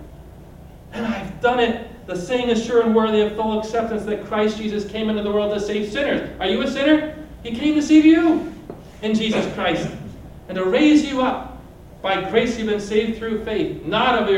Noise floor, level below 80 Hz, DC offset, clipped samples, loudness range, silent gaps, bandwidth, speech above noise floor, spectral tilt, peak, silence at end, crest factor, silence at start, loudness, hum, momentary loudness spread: -41 dBFS; -44 dBFS; under 0.1%; under 0.1%; 3 LU; none; 10.5 kHz; 22 dB; -5.5 dB/octave; -4 dBFS; 0 s; 16 dB; 0 s; -20 LUFS; none; 15 LU